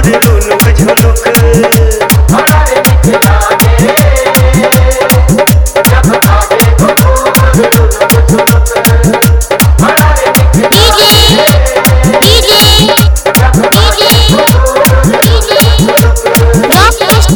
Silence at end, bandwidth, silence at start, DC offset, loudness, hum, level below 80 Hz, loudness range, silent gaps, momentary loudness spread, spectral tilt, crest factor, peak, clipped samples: 0 s; over 20 kHz; 0 s; under 0.1%; -5 LUFS; none; -10 dBFS; 2 LU; none; 4 LU; -4.5 dB/octave; 4 dB; 0 dBFS; 5%